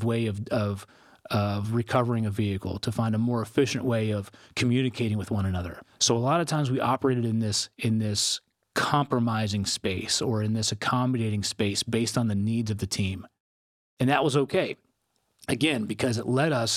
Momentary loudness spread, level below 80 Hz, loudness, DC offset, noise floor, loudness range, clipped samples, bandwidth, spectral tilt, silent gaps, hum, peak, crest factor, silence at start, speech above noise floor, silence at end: 6 LU; -62 dBFS; -27 LUFS; under 0.1%; -74 dBFS; 2 LU; under 0.1%; 15 kHz; -5 dB/octave; 13.40-13.97 s; none; -8 dBFS; 20 dB; 0 s; 48 dB; 0 s